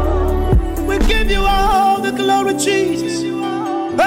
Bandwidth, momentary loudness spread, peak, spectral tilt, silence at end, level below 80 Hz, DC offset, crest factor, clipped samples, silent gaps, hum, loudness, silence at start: 16.5 kHz; 6 LU; -6 dBFS; -5 dB/octave; 0 s; -20 dBFS; under 0.1%; 8 dB; under 0.1%; none; none; -16 LUFS; 0 s